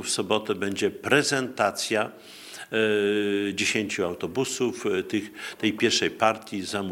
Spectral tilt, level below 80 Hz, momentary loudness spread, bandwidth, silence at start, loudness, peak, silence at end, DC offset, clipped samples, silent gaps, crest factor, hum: -3 dB/octave; -72 dBFS; 8 LU; 17.5 kHz; 0 s; -25 LUFS; -4 dBFS; 0 s; under 0.1%; under 0.1%; none; 22 dB; none